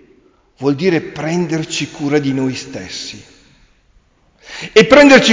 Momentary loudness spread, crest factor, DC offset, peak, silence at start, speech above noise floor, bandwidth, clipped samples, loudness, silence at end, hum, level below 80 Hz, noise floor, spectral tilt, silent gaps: 20 LU; 14 dB; under 0.1%; 0 dBFS; 0.6 s; 41 dB; 7.6 kHz; under 0.1%; -13 LUFS; 0 s; none; -48 dBFS; -53 dBFS; -4.5 dB/octave; none